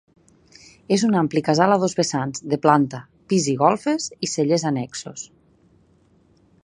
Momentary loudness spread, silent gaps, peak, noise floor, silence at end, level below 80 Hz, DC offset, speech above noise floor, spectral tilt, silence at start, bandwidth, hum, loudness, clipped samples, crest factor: 14 LU; none; -2 dBFS; -58 dBFS; 1.4 s; -64 dBFS; under 0.1%; 38 dB; -5 dB/octave; 0.9 s; 11 kHz; none; -21 LUFS; under 0.1%; 20 dB